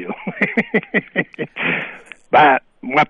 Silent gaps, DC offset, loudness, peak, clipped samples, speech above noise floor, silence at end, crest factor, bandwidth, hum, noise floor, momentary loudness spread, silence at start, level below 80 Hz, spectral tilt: none; under 0.1%; -18 LUFS; -2 dBFS; under 0.1%; 19 dB; 0.05 s; 16 dB; 8.8 kHz; none; -36 dBFS; 15 LU; 0 s; -60 dBFS; -6.5 dB/octave